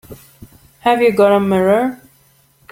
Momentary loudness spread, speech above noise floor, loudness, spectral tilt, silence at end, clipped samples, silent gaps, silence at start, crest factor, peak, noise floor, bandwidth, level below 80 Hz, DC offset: 7 LU; 41 dB; -14 LUFS; -6.5 dB/octave; 0.75 s; under 0.1%; none; 0.1 s; 16 dB; -2 dBFS; -53 dBFS; 17 kHz; -54 dBFS; under 0.1%